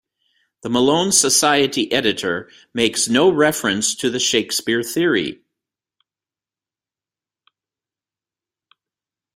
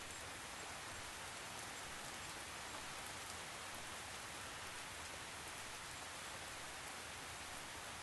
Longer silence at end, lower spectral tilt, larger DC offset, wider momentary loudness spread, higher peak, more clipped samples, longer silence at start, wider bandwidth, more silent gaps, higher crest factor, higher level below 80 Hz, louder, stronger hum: first, 4 s vs 0 s; about the same, -2.5 dB/octave vs -1.5 dB/octave; neither; first, 9 LU vs 1 LU; first, 0 dBFS vs -32 dBFS; neither; first, 0.65 s vs 0 s; first, 16 kHz vs 12 kHz; neither; about the same, 20 dB vs 18 dB; first, -60 dBFS vs -68 dBFS; first, -17 LUFS vs -48 LUFS; neither